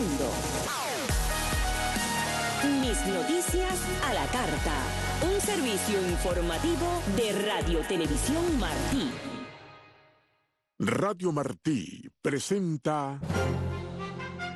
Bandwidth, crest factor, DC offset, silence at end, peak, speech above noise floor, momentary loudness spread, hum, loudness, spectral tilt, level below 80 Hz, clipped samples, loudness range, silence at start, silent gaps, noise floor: 12.5 kHz; 16 dB; under 0.1%; 0 s; -14 dBFS; 46 dB; 7 LU; none; -29 LUFS; -4 dB/octave; -38 dBFS; under 0.1%; 4 LU; 0 s; none; -75 dBFS